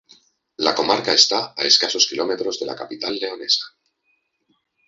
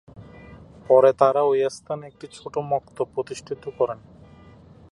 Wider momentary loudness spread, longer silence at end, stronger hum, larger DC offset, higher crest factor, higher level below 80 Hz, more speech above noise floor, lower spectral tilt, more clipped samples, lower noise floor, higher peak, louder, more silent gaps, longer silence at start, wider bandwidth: second, 13 LU vs 17 LU; first, 1.2 s vs 1 s; neither; neither; about the same, 22 dB vs 22 dB; second, -66 dBFS vs -58 dBFS; first, 49 dB vs 26 dB; second, -1 dB/octave vs -6 dB/octave; neither; first, -69 dBFS vs -48 dBFS; about the same, 0 dBFS vs -2 dBFS; first, -18 LUFS vs -22 LUFS; neither; first, 0.6 s vs 0.15 s; second, 8 kHz vs 11 kHz